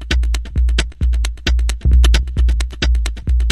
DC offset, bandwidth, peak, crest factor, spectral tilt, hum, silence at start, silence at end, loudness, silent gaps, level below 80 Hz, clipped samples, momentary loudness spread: under 0.1%; 12 kHz; 0 dBFS; 14 dB; -4.5 dB/octave; none; 0 s; 0 s; -17 LUFS; none; -14 dBFS; under 0.1%; 6 LU